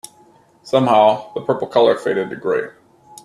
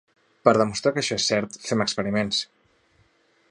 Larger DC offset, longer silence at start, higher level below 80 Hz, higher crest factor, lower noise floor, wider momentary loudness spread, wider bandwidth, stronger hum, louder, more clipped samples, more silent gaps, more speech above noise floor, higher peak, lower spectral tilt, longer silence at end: neither; first, 0.65 s vs 0.45 s; about the same, -64 dBFS vs -60 dBFS; about the same, 18 dB vs 22 dB; second, -51 dBFS vs -63 dBFS; first, 10 LU vs 7 LU; first, 13 kHz vs 11 kHz; neither; first, -17 LUFS vs -23 LUFS; neither; neither; second, 35 dB vs 40 dB; about the same, 0 dBFS vs -2 dBFS; first, -5.5 dB/octave vs -4 dB/octave; second, 0.55 s vs 1.05 s